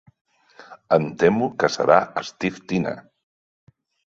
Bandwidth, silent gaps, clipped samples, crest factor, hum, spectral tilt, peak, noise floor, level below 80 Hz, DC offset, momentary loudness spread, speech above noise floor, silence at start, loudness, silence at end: 7.8 kHz; none; under 0.1%; 22 dB; none; -6 dB/octave; -2 dBFS; -47 dBFS; -60 dBFS; under 0.1%; 11 LU; 26 dB; 0.7 s; -21 LUFS; 1.15 s